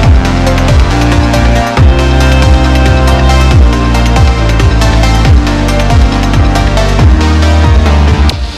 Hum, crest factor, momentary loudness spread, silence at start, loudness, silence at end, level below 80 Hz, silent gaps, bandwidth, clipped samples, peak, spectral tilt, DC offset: none; 6 dB; 2 LU; 0 s; -8 LUFS; 0 s; -8 dBFS; none; 13.5 kHz; 4%; 0 dBFS; -6 dB/octave; 0.7%